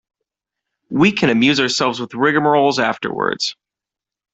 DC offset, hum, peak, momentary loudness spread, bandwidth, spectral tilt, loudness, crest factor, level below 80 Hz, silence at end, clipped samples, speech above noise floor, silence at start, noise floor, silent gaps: under 0.1%; none; 0 dBFS; 7 LU; 8.2 kHz; -4.5 dB/octave; -16 LUFS; 18 dB; -56 dBFS; 0.8 s; under 0.1%; 71 dB; 0.9 s; -87 dBFS; none